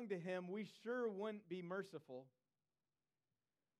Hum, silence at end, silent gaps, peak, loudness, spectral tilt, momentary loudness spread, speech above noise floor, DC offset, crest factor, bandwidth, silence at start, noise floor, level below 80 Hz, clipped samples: none; 1.5 s; none; -32 dBFS; -48 LUFS; -7 dB/octave; 11 LU; over 42 dB; under 0.1%; 16 dB; 13.5 kHz; 0 s; under -90 dBFS; under -90 dBFS; under 0.1%